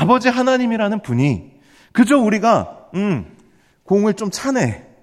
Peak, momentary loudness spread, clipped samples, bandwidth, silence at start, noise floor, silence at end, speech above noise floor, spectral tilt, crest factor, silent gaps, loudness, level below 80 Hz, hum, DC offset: -2 dBFS; 9 LU; under 0.1%; 13.5 kHz; 0 s; -53 dBFS; 0.2 s; 37 dB; -6 dB/octave; 16 dB; none; -18 LUFS; -54 dBFS; none; under 0.1%